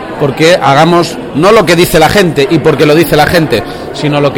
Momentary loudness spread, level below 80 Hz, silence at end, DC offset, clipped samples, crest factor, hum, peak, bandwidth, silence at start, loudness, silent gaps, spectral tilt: 8 LU; -30 dBFS; 0 s; under 0.1%; 1%; 8 dB; none; 0 dBFS; 20 kHz; 0 s; -7 LUFS; none; -5 dB/octave